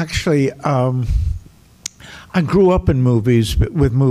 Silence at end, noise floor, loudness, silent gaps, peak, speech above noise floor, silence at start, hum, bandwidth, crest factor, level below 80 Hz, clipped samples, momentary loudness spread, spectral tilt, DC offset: 0 s; -37 dBFS; -16 LUFS; none; -4 dBFS; 22 dB; 0 s; none; 14.5 kHz; 12 dB; -26 dBFS; under 0.1%; 17 LU; -7 dB/octave; under 0.1%